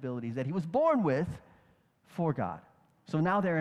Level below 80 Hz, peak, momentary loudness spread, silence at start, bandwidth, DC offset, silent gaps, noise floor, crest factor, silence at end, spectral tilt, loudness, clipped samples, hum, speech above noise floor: -64 dBFS; -16 dBFS; 14 LU; 0 s; 10.5 kHz; under 0.1%; none; -66 dBFS; 16 dB; 0 s; -8.5 dB/octave; -31 LUFS; under 0.1%; none; 36 dB